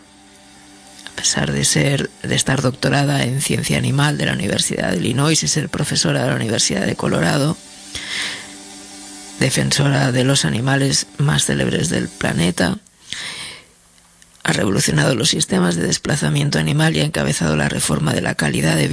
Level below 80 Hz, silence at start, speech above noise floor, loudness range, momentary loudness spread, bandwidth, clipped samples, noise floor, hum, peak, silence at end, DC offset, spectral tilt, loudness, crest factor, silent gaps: -42 dBFS; 0.85 s; 33 dB; 3 LU; 12 LU; 11 kHz; under 0.1%; -50 dBFS; none; -2 dBFS; 0 s; under 0.1%; -4 dB/octave; -17 LUFS; 18 dB; none